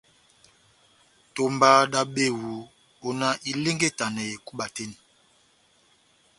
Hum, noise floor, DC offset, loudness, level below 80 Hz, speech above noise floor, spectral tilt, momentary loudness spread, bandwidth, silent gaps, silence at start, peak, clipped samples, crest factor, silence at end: none; -62 dBFS; under 0.1%; -24 LUFS; -68 dBFS; 38 dB; -3.5 dB/octave; 19 LU; 11.5 kHz; none; 1.35 s; -4 dBFS; under 0.1%; 24 dB; 1.45 s